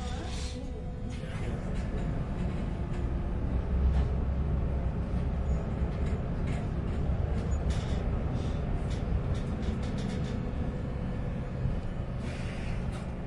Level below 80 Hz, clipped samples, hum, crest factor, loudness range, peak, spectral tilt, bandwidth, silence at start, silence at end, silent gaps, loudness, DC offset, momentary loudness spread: -34 dBFS; under 0.1%; none; 14 dB; 3 LU; -16 dBFS; -7.5 dB/octave; 11 kHz; 0 s; 0 s; none; -33 LUFS; under 0.1%; 5 LU